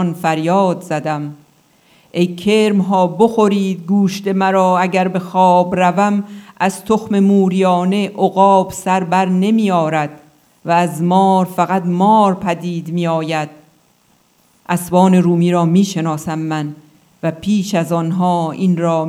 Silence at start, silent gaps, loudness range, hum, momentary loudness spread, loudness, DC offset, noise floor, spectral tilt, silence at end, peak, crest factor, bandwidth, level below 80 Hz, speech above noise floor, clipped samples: 0 s; none; 3 LU; none; 9 LU; -15 LUFS; under 0.1%; -55 dBFS; -6.5 dB/octave; 0 s; 0 dBFS; 14 dB; 14.5 kHz; -58 dBFS; 41 dB; under 0.1%